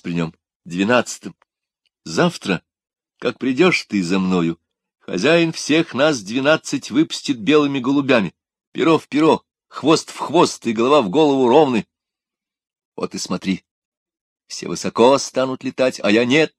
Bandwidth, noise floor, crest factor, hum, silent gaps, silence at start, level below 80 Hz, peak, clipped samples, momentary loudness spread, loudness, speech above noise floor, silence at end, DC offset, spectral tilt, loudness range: 12.5 kHz; -88 dBFS; 18 dB; none; 0.56-0.60 s, 8.67-8.72 s, 12.85-12.92 s, 13.71-14.06 s, 14.21-14.36 s; 0.05 s; -62 dBFS; 0 dBFS; under 0.1%; 13 LU; -18 LUFS; 70 dB; 0.1 s; under 0.1%; -5 dB/octave; 5 LU